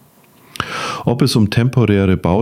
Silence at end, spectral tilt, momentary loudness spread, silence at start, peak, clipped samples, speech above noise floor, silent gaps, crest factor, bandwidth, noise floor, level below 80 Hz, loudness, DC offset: 0 s; -6.5 dB/octave; 9 LU; 0.6 s; -2 dBFS; under 0.1%; 35 dB; none; 14 dB; 15.5 kHz; -48 dBFS; -40 dBFS; -16 LUFS; under 0.1%